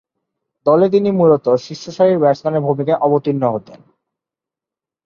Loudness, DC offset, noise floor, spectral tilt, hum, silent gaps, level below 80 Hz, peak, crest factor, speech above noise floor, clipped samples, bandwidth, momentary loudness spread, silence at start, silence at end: -15 LUFS; under 0.1%; -88 dBFS; -8 dB/octave; none; none; -60 dBFS; -2 dBFS; 16 dB; 73 dB; under 0.1%; 7.2 kHz; 7 LU; 0.65 s; 1.3 s